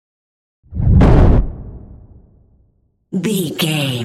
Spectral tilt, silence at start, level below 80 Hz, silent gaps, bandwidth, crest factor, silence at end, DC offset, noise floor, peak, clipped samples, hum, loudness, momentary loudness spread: -6.5 dB/octave; 0.7 s; -20 dBFS; none; 15.5 kHz; 14 dB; 0 s; under 0.1%; -59 dBFS; 0 dBFS; under 0.1%; none; -15 LUFS; 20 LU